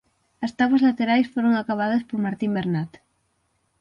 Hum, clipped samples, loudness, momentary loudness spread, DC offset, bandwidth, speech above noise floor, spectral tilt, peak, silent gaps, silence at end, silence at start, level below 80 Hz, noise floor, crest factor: none; under 0.1%; -22 LUFS; 11 LU; under 0.1%; 7.2 kHz; 48 dB; -7.5 dB/octave; -8 dBFS; none; 0.95 s; 0.4 s; -62 dBFS; -70 dBFS; 16 dB